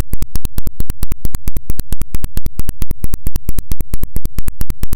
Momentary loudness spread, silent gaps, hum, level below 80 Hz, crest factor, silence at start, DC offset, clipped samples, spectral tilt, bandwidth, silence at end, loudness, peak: 1 LU; none; none; -20 dBFS; 6 dB; 0 s; under 0.1%; under 0.1%; -5.5 dB/octave; 17.5 kHz; 0 s; -25 LUFS; 0 dBFS